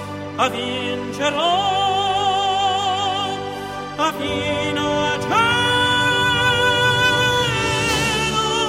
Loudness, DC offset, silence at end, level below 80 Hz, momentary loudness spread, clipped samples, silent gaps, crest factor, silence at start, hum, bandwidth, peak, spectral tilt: -18 LUFS; under 0.1%; 0 s; -42 dBFS; 8 LU; under 0.1%; none; 16 dB; 0 s; none; 16 kHz; -4 dBFS; -3.5 dB/octave